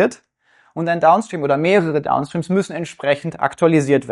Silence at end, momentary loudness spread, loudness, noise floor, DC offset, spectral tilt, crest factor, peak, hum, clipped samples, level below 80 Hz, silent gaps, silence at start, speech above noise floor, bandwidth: 0 s; 9 LU; -18 LUFS; -57 dBFS; under 0.1%; -6.5 dB/octave; 16 dB; -2 dBFS; none; under 0.1%; -60 dBFS; none; 0 s; 40 dB; 11.5 kHz